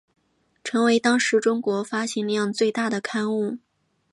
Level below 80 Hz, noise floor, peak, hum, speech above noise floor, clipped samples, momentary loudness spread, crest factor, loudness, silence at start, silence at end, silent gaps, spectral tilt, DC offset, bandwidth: -74 dBFS; -49 dBFS; -6 dBFS; none; 27 dB; under 0.1%; 8 LU; 18 dB; -23 LUFS; 0.65 s; 0.55 s; none; -4 dB/octave; under 0.1%; 11.5 kHz